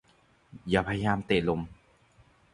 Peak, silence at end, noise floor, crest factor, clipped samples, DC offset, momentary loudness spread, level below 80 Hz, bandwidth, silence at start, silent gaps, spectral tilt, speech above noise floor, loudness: -10 dBFS; 0.8 s; -64 dBFS; 22 dB; under 0.1%; under 0.1%; 14 LU; -52 dBFS; 11 kHz; 0.55 s; none; -7 dB/octave; 36 dB; -29 LUFS